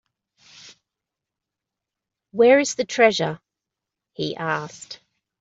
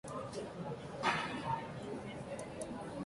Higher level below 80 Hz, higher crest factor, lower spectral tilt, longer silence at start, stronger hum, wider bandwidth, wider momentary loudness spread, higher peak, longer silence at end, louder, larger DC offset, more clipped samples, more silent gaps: about the same, -68 dBFS vs -64 dBFS; about the same, 20 dB vs 22 dB; about the same, -4 dB/octave vs -5 dB/octave; first, 2.35 s vs 0.05 s; neither; second, 8 kHz vs 11.5 kHz; first, 23 LU vs 9 LU; first, -4 dBFS vs -20 dBFS; first, 0.45 s vs 0 s; first, -20 LUFS vs -41 LUFS; neither; neither; neither